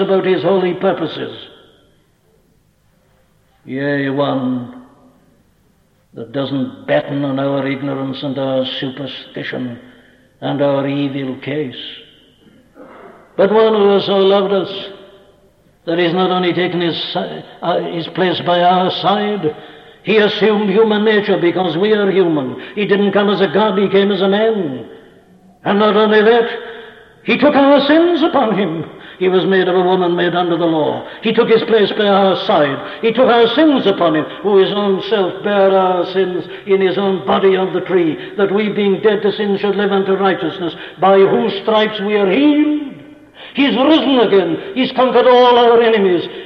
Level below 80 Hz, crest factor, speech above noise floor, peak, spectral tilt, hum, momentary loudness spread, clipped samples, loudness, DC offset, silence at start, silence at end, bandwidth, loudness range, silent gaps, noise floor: -58 dBFS; 14 dB; 42 dB; -2 dBFS; -8 dB/octave; none; 13 LU; under 0.1%; -14 LUFS; under 0.1%; 0 s; 0 s; 6 kHz; 9 LU; none; -55 dBFS